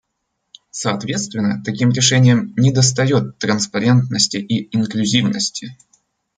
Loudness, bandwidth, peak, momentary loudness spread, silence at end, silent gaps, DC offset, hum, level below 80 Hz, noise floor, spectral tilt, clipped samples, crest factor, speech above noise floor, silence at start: -16 LUFS; 9.4 kHz; -2 dBFS; 9 LU; 0.65 s; none; under 0.1%; none; -56 dBFS; -73 dBFS; -4.5 dB/octave; under 0.1%; 16 dB; 57 dB; 0.75 s